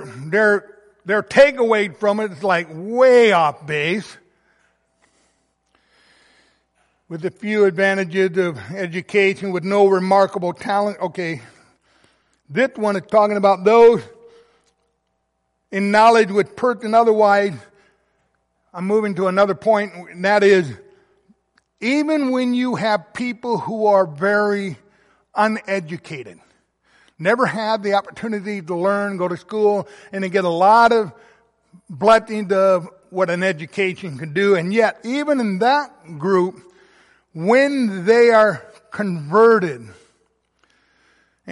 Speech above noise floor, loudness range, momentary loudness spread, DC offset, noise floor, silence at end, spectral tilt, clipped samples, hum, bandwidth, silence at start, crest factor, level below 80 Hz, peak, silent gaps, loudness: 54 dB; 6 LU; 14 LU; under 0.1%; -71 dBFS; 0 s; -6 dB/octave; under 0.1%; none; 11.5 kHz; 0 s; 16 dB; -64 dBFS; -2 dBFS; none; -17 LUFS